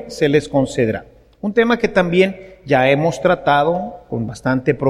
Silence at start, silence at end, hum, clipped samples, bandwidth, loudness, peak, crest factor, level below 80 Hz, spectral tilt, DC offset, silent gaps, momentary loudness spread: 0 s; 0 s; none; under 0.1%; 13.5 kHz; -17 LUFS; 0 dBFS; 16 dB; -46 dBFS; -6.5 dB/octave; under 0.1%; none; 11 LU